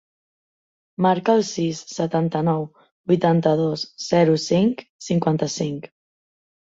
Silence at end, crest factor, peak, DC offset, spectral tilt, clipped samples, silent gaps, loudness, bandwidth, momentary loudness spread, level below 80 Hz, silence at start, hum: 0.8 s; 18 dB; -4 dBFS; under 0.1%; -6 dB/octave; under 0.1%; 2.92-3.04 s, 4.90-4.99 s; -21 LUFS; 7.8 kHz; 10 LU; -60 dBFS; 1 s; none